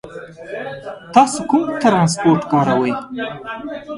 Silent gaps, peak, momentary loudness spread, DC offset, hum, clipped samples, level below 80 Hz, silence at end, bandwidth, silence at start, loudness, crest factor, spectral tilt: none; 0 dBFS; 16 LU; under 0.1%; none; under 0.1%; -54 dBFS; 0 s; 11.5 kHz; 0.05 s; -16 LUFS; 18 dB; -5.5 dB/octave